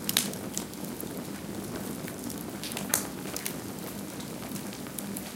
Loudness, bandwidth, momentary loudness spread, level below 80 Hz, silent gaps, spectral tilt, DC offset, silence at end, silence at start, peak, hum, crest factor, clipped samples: -34 LUFS; 17 kHz; 9 LU; -58 dBFS; none; -3 dB/octave; under 0.1%; 0 s; 0 s; -2 dBFS; none; 34 dB; under 0.1%